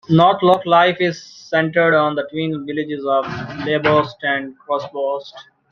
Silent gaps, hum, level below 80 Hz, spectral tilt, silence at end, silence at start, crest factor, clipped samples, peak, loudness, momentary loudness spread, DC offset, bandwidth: none; none; -58 dBFS; -6.5 dB/octave; 0.3 s; 0.1 s; 18 dB; under 0.1%; 0 dBFS; -18 LUFS; 11 LU; under 0.1%; 7 kHz